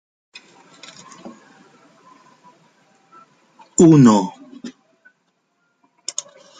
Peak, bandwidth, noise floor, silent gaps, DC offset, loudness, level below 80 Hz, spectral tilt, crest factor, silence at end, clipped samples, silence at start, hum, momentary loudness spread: -2 dBFS; 9.6 kHz; -68 dBFS; none; under 0.1%; -15 LUFS; -60 dBFS; -6.5 dB/octave; 20 dB; 1.9 s; under 0.1%; 1.25 s; none; 30 LU